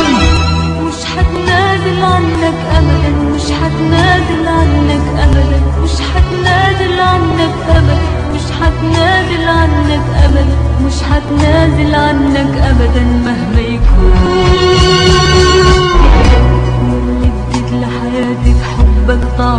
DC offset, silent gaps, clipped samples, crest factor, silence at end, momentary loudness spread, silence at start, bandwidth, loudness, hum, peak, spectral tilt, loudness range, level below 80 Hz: under 0.1%; none; under 0.1%; 10 dB; 0 s; 6 LU; 0 s; 10 kHz; -10 LUFS; none; 0 dBFS; -6 dB/octave; 3 LU; -14 dBFS